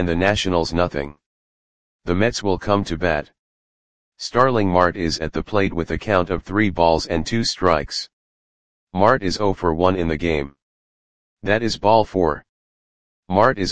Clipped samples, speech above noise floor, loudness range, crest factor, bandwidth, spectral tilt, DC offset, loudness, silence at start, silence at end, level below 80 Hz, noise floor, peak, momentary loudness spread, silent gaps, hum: under 0.1%; over 71 dB; 3 LU; 20 dB; 9.8 kHz; -5.5 dB/octave; 2%; -20 LUFS; 0 s; 0 s; -40 dBFS; under -90 dBFS; 0 dBFS; 10 LU; 1.26-1.99 s, 3.39-4.12 s, 8.13-8.87 s, 10.62-11.37 s, 12.49-13.23 s; none